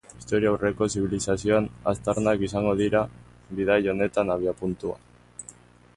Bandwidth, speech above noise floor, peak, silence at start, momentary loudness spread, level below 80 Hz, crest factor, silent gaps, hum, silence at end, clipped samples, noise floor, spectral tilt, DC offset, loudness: 11.5 kHz; 26 dB; -10 dBFS; 0.15 s; 17 LU; -48 dBFS; 16 dB; none; 60 Hz at -45 dBFS; 0.45 s; under 0.1%; -50 dBFS; -5.5 dB/octave; under 0.1%; -25 LUFS